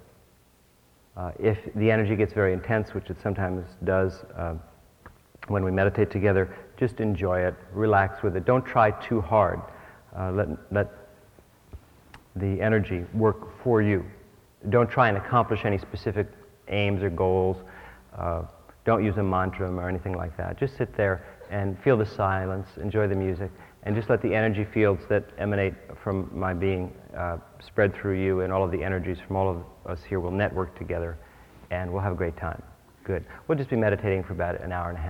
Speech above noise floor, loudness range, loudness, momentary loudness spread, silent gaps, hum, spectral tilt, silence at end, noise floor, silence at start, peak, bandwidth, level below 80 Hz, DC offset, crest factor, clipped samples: 34 dB; 5 LU; -27 LUFS; 12 LU; none; none; -9 dB/octave; 0 s; -60 dBFS; 1.15 s; -6 dBFS; 6.2 kHz; -48 dBFS; under 0.1%; 20 dB; under 0.1%